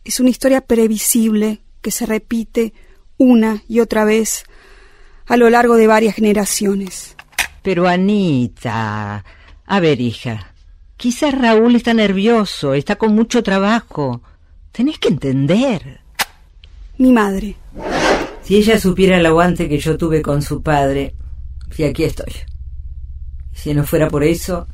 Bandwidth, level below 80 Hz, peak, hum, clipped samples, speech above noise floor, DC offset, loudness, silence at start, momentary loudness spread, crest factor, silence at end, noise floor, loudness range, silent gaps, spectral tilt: 16 kHz; -34 dBFS; 0 dBFS; none; under 0.1%; 28 dB; under 0.1%; -15 LUFS; 0.05 s; 17 LU; 16 dB; 0 s; -42 dBFS; 5 LU; none; -5 dB/octave